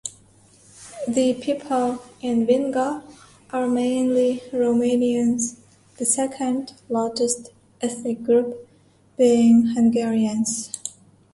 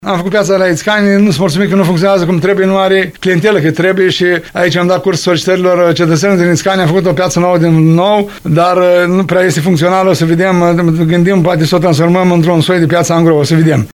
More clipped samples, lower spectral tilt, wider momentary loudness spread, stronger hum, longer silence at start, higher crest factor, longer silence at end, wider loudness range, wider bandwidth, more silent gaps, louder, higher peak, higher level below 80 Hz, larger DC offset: neither; second, -4.5 dB/octave vs -6 dB/octave; first, 13 LU vs 3 LU; neither; about the same, 0.05 s vs 0 s; first, 16 dB vs 8 dB; first, 0.45 s vs 0.05 s; first, 4 LU vs 1 LU; second, 11.5 kHz vs 16 kHz; neither; second, -22 LUFS vs -9 LUFS; second, -6 dBFS vs 0 dBFS; second, -62 dBFS vs -42 dBFS; neither